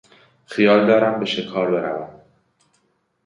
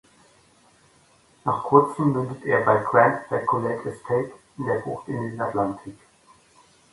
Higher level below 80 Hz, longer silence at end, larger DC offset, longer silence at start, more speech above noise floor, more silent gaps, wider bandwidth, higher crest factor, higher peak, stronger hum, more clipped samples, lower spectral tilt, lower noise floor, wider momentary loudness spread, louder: about the same, -64 dBFS vs -62 dBFS; first, 1.15 s vs 1 s; neither; second, 0.5 s vs 1.45 s; first, 49 dB vs 35 dB; neither; about the same, 10.5 kHz vs 11.5 kHz; second, 18 dB vs 24 dB; about the same, -2 dBFS vs 0 dBFS; neither; neither; second, -6.5 dB/octave vs -8 dB/octave; first, -67 dBFS vs -58 dBFS; first, 16 LU vs 13 LU; first, -19 LUFS vs -23 LUFS